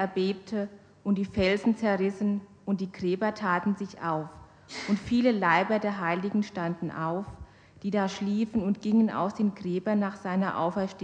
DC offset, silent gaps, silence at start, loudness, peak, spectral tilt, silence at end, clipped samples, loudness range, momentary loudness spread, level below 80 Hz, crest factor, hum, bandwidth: under 0.1%; none; 0 s; -28 LUFS; -10 dBFS; -7 dB/octave; 0 s; under 0.1%; 2 LU; 9 LU; -56 dBFS; 20 dB; none; 8.8 kHz